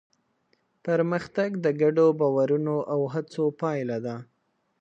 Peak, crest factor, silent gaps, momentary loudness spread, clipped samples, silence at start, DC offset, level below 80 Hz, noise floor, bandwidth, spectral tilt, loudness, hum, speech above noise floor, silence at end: -10 dBFS; 16 dB; none; 10 LU; under 0.1%; 0.85 s; under 0.1%; -72 dBFS; -70 dBFS; 8.2 kHz; -8 dB/octave; -25 LUFS; none; 45 dB; 0.55 s